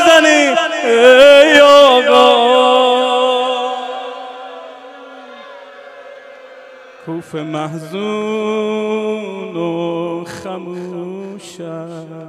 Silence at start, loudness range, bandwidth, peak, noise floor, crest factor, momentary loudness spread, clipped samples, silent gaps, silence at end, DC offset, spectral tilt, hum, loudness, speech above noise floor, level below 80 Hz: 0 s; 21 LU; 14.5 kHz; 0 dBFS; -38 dBFS; 14 dB; 23 LU; 0.6%; none; 0 s; under 0.1%; -3.5 dB/octave; none; -11 LUFS; 21 dB; -58 dBFS